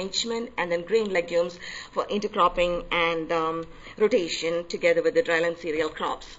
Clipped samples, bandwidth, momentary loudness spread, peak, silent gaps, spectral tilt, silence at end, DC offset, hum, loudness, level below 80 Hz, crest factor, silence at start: under 0.1%; 8 kHz; 9 LU; -8 dBFS; none; -3.5 dB/octave; 0 s; 0.1%; none; -25 LUFS; -50 dBFS; 16 dB; 0 s